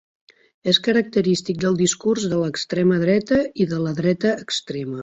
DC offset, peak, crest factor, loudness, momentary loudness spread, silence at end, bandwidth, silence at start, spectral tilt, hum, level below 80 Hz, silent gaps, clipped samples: under 0.1%; -2 dBFS; 18 dB; -20 LUFS; 7 LU; 0 s; 8.2 kHz; 0.65 s; -5 dB/octave; none; -56 dBFS; none; under 0.1%